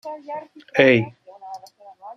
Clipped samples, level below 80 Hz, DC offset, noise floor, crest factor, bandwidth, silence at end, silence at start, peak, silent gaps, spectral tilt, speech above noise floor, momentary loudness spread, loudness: under 0.1%; -64 dBFS; under 0.1%; -44 dBFS; 20 dB; 7.4 kHz; 0.05 s; 0.05 s; -2 dBFS; none; -6.5 dB/octave; 24 dB; 23 LU; -17 LUFS